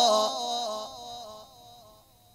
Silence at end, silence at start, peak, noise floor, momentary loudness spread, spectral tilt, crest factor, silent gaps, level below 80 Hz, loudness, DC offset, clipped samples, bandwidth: 0.45 s; 0 s; -10 dBFS; -57 dBFS; 25 LU; -1.5 dB/octave; 20 dB; none; -68 dBFS; -29 LUFS; under 0.1%; under 0.1%; 16 kHz